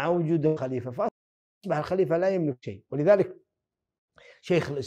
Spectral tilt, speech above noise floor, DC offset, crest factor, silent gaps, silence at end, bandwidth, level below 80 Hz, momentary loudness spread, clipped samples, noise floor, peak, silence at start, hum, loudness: -8 dB/octave; 61 dB; under 0.1%; 20 dB; 1.11-1.61 s, 3.98-4.08 s; 0 s; 9.4 kHz; -66 dBFS; 11 LU; under 0.1%; -86 dBFS; -8 dBFS; 0 s; none; -26 LUFS